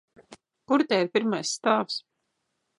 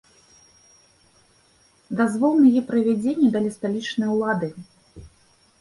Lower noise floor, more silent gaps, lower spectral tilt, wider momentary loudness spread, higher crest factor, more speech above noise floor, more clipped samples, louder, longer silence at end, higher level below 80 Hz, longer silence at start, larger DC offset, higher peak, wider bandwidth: first, -78 dBFS vs -59 dBFS; neither; second, -3.5 dB/octave vs -6.5 dB/octave; second, 7 LU vs 10 LU; about the same, 20 dB vs 16 dB; first, 53 dB vs 39 dB; neither; second, -26 LUFS vs -21 LUFS; first, 0.8 s vs 0.55 s; second, -78 dBFS vs -60 dBFS; second, 0.3 s vs 1.9 s; neither; about the same, -8 dBFS vs -8 dBFS; about the same, 11 kHz vs 11.5 kHz